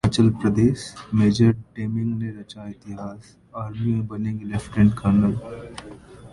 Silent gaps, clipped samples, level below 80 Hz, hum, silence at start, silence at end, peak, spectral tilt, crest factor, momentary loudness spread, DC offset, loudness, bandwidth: none; under 0.1%; -44 dBFS; none; 0.05 s; 0.05 s; -4 dBFS; -7.5 dB/octave; 18 dB; 18 LU; under 0.1%; -22 LUFS; 11.5 kHz